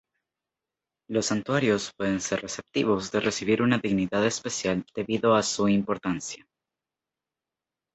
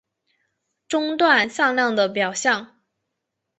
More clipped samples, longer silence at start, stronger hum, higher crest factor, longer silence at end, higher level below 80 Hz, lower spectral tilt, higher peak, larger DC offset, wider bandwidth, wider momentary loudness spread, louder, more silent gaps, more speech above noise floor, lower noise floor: neither; first, 1.1 s vs 0.9 s; neither; about the same, 22 dB vs 20 dB; first, 1.6 s vs 0.95 s; first, -60 dBFS vs -70 dBFS; first, -4.5 dB/octave vs -2.5 dB/octave; second, -6 dBFS vs -2 dBFS; neither; about the same, 8.2 kHz vs 8.4 kHz; about the same, 8 LU vs 8 LU; second, -26 LUFS vs -20 LUFS; neither; about the same, 63 dB vs 60 dB; first, -89 dBFS vs -80 dBFS